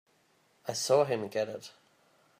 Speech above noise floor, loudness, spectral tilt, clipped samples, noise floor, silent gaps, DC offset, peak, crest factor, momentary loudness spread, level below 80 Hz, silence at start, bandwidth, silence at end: 39 dB; -30 LUFS; -3.5 dB/octave; under 0.1%; -69 dBFS; none; under 0.1%; -14 dBFS; 20 dB; 18 LU; -82 dBFS; 0.65 s; 15.5 kHz; 0.7 s